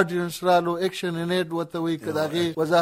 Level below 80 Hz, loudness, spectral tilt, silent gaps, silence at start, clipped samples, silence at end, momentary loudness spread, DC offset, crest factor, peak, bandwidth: -64 dBFS; -25 LUFS; -5.5 dB/octave; none; 0 s; under 0.1%; 0 s; 6 LU; under 0.1%; 18 dB; -6 dBFS; 16 kHz